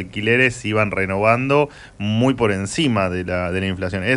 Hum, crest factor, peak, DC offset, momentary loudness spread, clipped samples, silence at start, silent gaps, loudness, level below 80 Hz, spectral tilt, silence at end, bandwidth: none; 16 dB; -2 dBFS; under 0.1%; 7 LU; under 0.1%; 0 s; none; -19 LUFS; -46 dBFS; -5.5 dB/octave; 0 s; 11.5 kHz